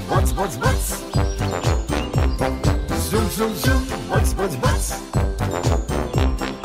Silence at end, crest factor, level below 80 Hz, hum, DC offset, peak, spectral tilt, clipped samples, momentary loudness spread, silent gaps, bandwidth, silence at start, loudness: 0 s; 14 dB; -24 dBFS; none; under 0.1%; -6 dBFS; -5.5 dB/octave; under 0.1%; 3 LU; none; 16 kHz; 0 s; -22 LUFS